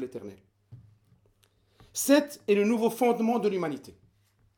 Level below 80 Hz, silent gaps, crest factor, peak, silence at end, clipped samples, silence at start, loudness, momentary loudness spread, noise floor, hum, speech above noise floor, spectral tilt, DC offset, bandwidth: -70 dBFS; none; 20 dB; -10 dBFS; 0.65 s; under 0.1%; 0 s; -26 LUFS; 17 LU; -67 dBFS; none; 40 dB; -4.5 dB/octave; under 0.1%; over 20 kHz